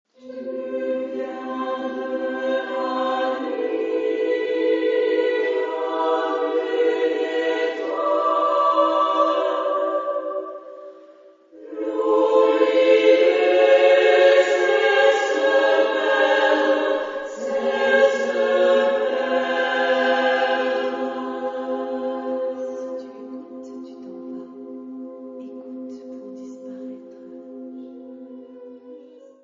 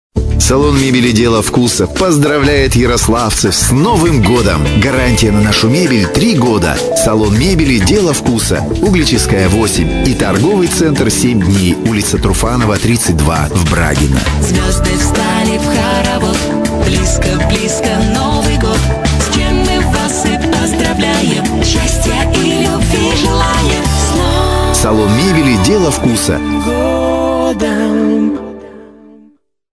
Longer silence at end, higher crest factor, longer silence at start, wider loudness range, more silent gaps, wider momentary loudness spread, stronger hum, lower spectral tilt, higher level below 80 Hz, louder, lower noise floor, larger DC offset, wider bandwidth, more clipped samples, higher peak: second, 0.25 s vs 0.9 s; first, 18 dB vs 10 dB; about the same, 0.25 s vs 0.15 s; first, 20 LU vs 2 LU; neither; first, 21 LU vs 3 LU; neither; second, -3 dB/octave vs -4.5 dB/octave; second, -74 dBFS vs -20 dBFS; second, -20 LUFS vs -11 LUFS; about the same, -49 dBFS vs -47 dBFS; neither; second, 7.6 kHz vs 11 kHz; neither; second, -4 dBFS vs 0 dBFS